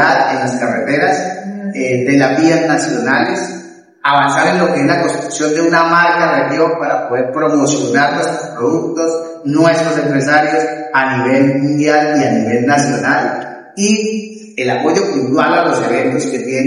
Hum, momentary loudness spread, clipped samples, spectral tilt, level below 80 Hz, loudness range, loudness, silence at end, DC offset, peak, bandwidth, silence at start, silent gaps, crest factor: none; 8 LU; under 0.1%; -5 dB/octave; -60 dBFS; 2 LU; -13 LUFS; 0 s; under 0.1%; 0 dBFS; 11.5 kHz; 0 s; none; 12 dB